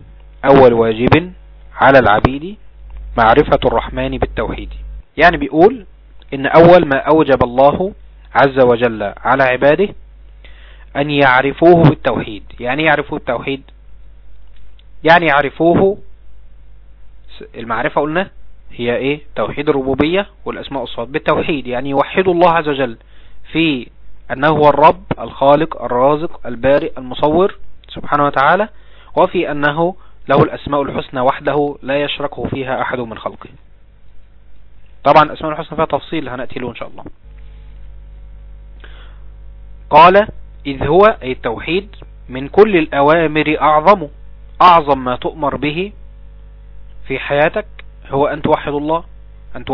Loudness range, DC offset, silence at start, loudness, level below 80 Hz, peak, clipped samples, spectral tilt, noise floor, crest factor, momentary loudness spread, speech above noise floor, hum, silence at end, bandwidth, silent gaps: 7 LU; under 0.1%; 0.4 s; -13 LUFS; -36 dBFS; 0 dBFS; 0.5%; -8.5 dB/octave; -38 dBFS; 14 dB; 16 LU; 25 dB; none; 0 s; 5.4 kHz; none